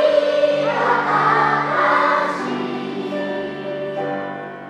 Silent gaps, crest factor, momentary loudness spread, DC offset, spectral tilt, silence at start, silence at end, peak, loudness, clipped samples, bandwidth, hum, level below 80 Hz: none; 16 dB; 10 LU; under 0.1%; -5.5 dB/octave; 0 s; 0 s; -4 dBFS; -19 LUFS; under 0.1%; 10.5 kHz; none; -64 dBFS